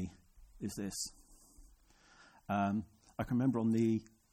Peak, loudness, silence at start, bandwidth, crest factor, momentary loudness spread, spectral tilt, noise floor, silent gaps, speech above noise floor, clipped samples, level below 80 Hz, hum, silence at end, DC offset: -22 dBFS; -36 LUFS; 0 s; 14.5 kHz; 16 dB; 14 LU; -6 dB/octave; -65 dBFS; none; 30 dB; under 0.1%; -62 dBFS; none; 0.3 s; under 0.1%